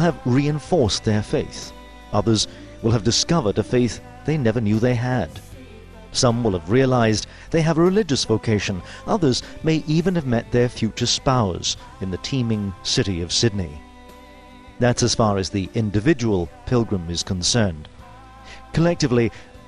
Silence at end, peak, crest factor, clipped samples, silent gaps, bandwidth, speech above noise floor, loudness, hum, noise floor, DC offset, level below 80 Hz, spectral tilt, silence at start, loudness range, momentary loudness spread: 0.05 s; -4 dBFS; 16 dB; under 0.1%; none; 11 kHz; 23 dB; -21 LUFS; none; -43 dBFS; under 0.1%; -42 dBFS; -5 dB/octave; 0 s; 3 LU; 8 LU